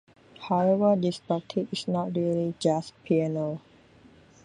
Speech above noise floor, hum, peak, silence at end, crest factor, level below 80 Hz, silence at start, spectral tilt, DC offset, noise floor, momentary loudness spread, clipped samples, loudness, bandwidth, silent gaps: 29 dB; none; -10 dBFS; 0.85 s; 18 dB; -68 dBFS; 0.4 s; -7 dB/octave; under 0.1%; -55 dBFS; 9 LU; under 0.1%; -27 LUFS; 11 kHz; none